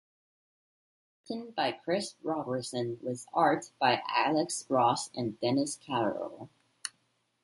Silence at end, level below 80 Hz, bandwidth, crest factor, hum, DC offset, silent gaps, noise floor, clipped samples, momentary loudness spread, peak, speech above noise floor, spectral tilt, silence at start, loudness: 0.55 s; -76 dBFS; 11.5 kHz; 20 dB; none; under 0.1%; none; -75 dBFS; under 0.1%; 14 LU; -12 dBFS; 44 dB; -4 dB/octave; 1.3 s; -31 LUFS